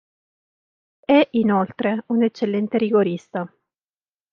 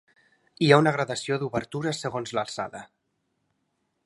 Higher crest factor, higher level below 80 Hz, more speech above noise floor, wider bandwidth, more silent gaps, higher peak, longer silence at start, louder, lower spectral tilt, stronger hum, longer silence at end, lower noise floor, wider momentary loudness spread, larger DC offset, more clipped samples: second, 18 dB vs 26 dB; about the same, -68 dBFS vs -64 dBFS; first, over 71 dB vs 51 dB; second, 6.8 kHz vs 11.5 kHz; neither; about the same, -4 dBFS vs -2 dBFS; first, 1.1 s vs 0.6 s; first, -20 LUFS vs -25 LUFS; first, -8 dB/octave vs -5.5 dB/octave; neither; second, 0.85 s vs 1.2 s; first, under -90 dBFS vs -76 dBFS; about the same, 13 LU vs 14 LU; neither; neither